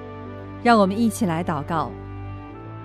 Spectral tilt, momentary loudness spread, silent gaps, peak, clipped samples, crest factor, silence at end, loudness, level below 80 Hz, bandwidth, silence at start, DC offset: -6 dB/octave; 19 LU; none; -4 dBFS; under 0.1%; 18 dB; 0 s; -21 LUFS; -46 dBFS; 14 kHz; 0 s; under 0.1%